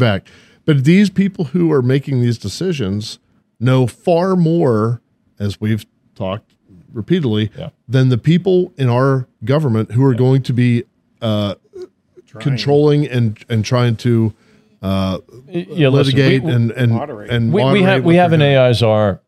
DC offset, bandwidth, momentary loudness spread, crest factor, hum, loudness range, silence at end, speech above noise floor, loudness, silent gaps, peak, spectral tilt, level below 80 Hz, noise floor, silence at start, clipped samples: under 0.1%; 12.5 kHz; 13 LU; 14 dB; none; 5 LU; 0.1 s; 33 dB; -15 LUFS; none; 0 dBFS; -7.5 dB/octave; -52 dBFS; -47 dBFS; 0 s; under 0.1%